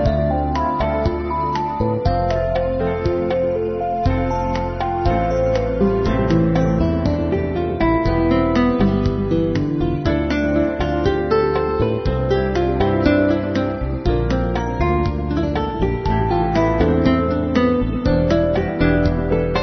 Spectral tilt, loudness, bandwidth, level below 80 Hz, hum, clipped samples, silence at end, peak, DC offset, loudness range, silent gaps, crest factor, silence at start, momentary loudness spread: -8.5 dB/octave; -19 LUFS; 6.4 kHz; -28 dBFS; none; under 0.1%; 0 s; -2 dBFS; under 0.1%; 2 LU; none; 16 dB; 0 s; 4 LU